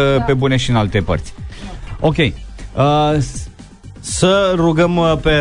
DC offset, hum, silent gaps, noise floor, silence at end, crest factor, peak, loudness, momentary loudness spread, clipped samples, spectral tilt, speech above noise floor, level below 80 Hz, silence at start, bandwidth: under 0.1%; none; none; -36 dBFS; 0 s; 14 dB; -2 dBFS; -15 LUFS; 18 LU; under 0.1%; -5.5 dB/octave; 22 dB; -30 dBFS; 0 s; 11 kHz